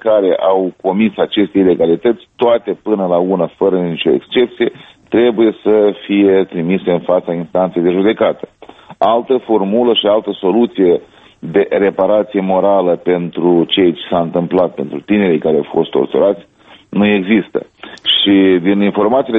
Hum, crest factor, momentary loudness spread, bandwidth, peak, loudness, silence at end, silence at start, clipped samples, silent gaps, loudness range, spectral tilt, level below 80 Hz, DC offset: none; 14 dB; 6 LU; 4.1 kHz; 0 dBFS; -13 LUFS; 0 s; 0.05 s; under 0.1%; none; 1 LU; -8.5 dB/octave; -54 dBFS; under 0.1%